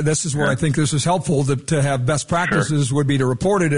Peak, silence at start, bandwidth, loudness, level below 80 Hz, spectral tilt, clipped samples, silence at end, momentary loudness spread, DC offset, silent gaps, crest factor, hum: -8 dBFS; 0 s; 11 kHz; -19 LUFS; -44 dBFS; -5.5 dB/octave; under 0.1%; 0 s; 1 LU; 0.5%; none; 12 dB; none